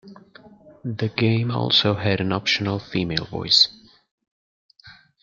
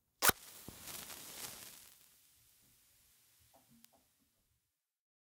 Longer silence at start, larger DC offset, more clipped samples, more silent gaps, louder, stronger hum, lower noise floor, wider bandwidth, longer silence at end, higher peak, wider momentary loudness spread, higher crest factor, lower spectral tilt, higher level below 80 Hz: second, 0.05 s vs 0.2 s; neither; neither; first, 4.11-4.18 s, 4.28-4.69 s vs none; first, -20 LUFS vs -39 LUFS; neither; second, -50 dBFS vs -86 dBFS; second, 7.6 kHz vs 16 kHz; second, 0.3 s vs 3.3 s; first, -2 dBFS vs -6 dBFS; second, 11 LU vs 22 LU; second, 22 dB vs 38 dB; first, -5 dB/octave vs -1 dB/octave; first, -56 dBFS vs -70 dBFS